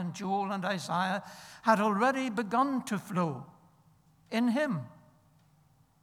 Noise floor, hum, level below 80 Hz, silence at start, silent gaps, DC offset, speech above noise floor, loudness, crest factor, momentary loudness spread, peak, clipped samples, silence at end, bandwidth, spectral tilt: -65 dBFS; none; -76 dBFS; 0 s; none; under 0.1%; 35 dB; -31 LUFS; 20 dB; 10 LU; -12 dBFS; under 0.1%; 1.1 s; 15 kHz; -5.5 dB/octave